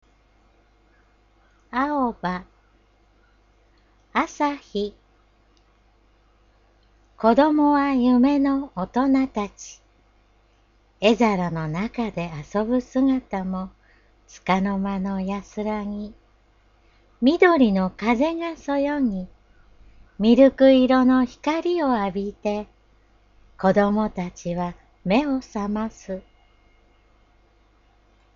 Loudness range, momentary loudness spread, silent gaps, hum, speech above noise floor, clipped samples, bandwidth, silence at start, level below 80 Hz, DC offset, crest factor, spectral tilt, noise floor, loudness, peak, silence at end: 11 LU; 15 LU; none; 50 Hz at -50 dBFS; 38 dB; under 0.1%; 7.2 kHz; 1.75 s; -50 dBFS; under 0.1%; 20 dB; -6.5 dB/octave; -59 dBFS; -22 LUFS; -2 dBFS; 2.15 s